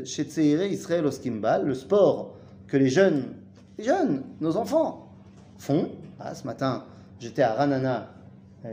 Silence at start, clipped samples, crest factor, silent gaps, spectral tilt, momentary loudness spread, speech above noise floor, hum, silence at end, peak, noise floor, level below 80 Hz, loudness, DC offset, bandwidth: 0 s; under 0.1%; 20 dB; none; -6.5 dB/octave; 18 LU; 24 dB; none; 0 s; -6 dBFS; -49 dBFS; -66 dBFS; -25 LUFS; under 0.1%; 15.5 kHz